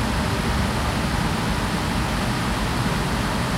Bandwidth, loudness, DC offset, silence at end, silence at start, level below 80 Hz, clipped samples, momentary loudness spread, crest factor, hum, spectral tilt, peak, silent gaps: 16 kHz; -23 LUFS; under 0.1%; 0 s; 0 s; -30 dBFS; under 0.1%; 1 LU; 12 dB; none; -5 dB/octave; -10 dBFS; none